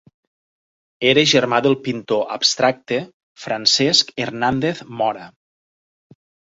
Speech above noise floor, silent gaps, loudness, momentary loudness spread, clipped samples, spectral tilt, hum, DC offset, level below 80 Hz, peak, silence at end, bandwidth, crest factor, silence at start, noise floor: over 72 dB; 3.14-3.35 s; -18 LUFS; 11 LU; under 0.1%; -3 dB/octave; none; under 0.1%; -58 dBFS; 0 dBFS; 1.25 s; 8 kHz; 20 dB; 1 s; under -90 dBFS